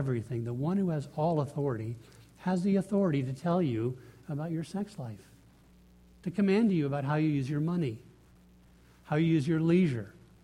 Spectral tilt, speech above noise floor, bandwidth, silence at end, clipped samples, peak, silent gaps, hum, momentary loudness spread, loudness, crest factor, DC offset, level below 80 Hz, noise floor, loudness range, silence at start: -8.5 dB/octave; 29 dB; 11.5 kHz; 0.3 s; under 0.1%; -16 dBFS; none; 60 Hz at -55 dBFS; 14 LU; -31 LUFS; 16 dB; under 0.1%; -62 dBFS; -59 dBFS; 3 LU; 0 s